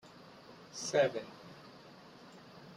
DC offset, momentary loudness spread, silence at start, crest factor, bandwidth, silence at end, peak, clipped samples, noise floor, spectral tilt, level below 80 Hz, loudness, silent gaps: under 0.1%; 24 LU; 0.05 s; 22 dB; 12.5 kHz; 0 s; -18 dBFS; under 0.1%; -56 dBFS; -3.5 dB/octave; -80 dBFS; -35 LUFS; none